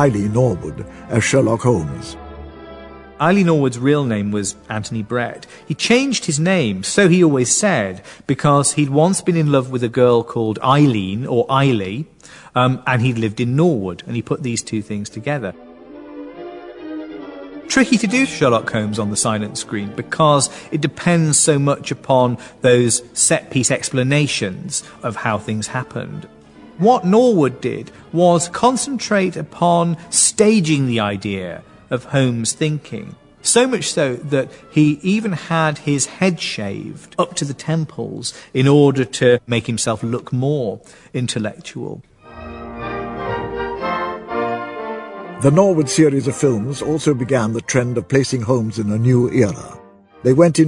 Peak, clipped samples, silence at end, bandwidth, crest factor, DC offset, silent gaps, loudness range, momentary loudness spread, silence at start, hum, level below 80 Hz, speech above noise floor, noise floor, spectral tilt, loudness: 0 dBFS; under 0.1%; 0 s; 11 kHz; 16 dB; under 0.1%; none; 7 LU; 16 LU; 0 s; none; -50 dBFS; 20 dB; -37 dBFS; -5 dB/octave; -17 LUFS